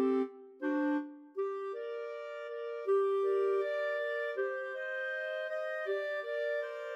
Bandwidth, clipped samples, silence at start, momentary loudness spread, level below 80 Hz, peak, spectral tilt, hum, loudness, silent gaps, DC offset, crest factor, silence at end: 7.8 kHz; under 0.1%; 0 s; 10 LU; under -90 dBFS; -22 dBFS; -4 dB/octave; none; -35 LUFS; none; under 0.1%; 14 dB; 0 s